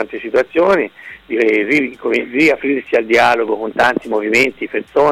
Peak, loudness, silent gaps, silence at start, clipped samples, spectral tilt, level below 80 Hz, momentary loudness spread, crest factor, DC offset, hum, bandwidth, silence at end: -2 dBFS; -15 LUFS; none; 0 s; under 0.1%; -4.5 dB/octave; -52 dBFS; 7 LU; 12 dB; under 0.1%; none; 15.5 kHz; 0 s